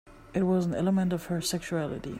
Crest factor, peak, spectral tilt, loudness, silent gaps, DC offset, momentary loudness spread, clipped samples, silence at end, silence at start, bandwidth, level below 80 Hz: 14 dB; -16 dBFS; -6 dB/octave; -29 LUFS; none; under 0.1%; 6 LU; under 0.1%; 0 s; 0.05 s; 16 kHz; -54 dBFS